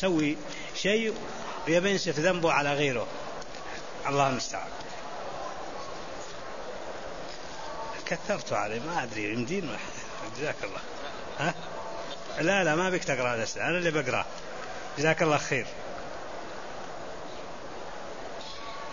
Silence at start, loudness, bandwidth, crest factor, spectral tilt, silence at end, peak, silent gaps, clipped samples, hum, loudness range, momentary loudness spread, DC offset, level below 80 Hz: 0 s; -31 LUFS; 7.4 kHz; 22 dB; -4 dB/octave; 0 s; -10 dBFS; none; under 0.1%; none; 9 LU; 14 LU; 0.9%; -56 dBFS